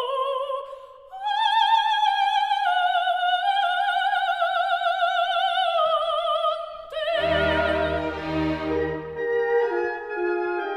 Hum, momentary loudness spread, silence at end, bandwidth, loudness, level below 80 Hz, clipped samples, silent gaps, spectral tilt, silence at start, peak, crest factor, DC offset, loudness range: none; 8 LU; 0 s; 16.5 kHz; -23 LUFS; -48 dBFS; under 0.1%; none; -5 dB/octave; 0 s; -8 dBFS; 14 dB; under 0.1%; 3 LU